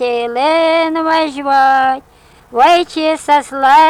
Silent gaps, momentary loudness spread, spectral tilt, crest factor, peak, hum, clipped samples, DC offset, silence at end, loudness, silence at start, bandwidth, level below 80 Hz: none; 6 LU; -2.5 dB/octave; 12 dB; 0 dBFS; none; under 0.1%; under 0.1%; 0 s; -12 LUFS; 0 s; 15.5 kHz; -52 dBFS